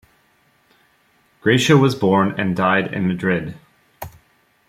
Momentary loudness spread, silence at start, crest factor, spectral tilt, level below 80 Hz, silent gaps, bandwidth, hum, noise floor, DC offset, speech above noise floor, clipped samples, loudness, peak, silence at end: 23 LU; 1.45 s; 18 dB; -6 dB/octave; -54 dBFS; none; 15.5 kHz; none; -59 dBFS; under 0.1%; 42 dB; under 0.1%; -17 LUFS; -2 dBFS; 0.6 s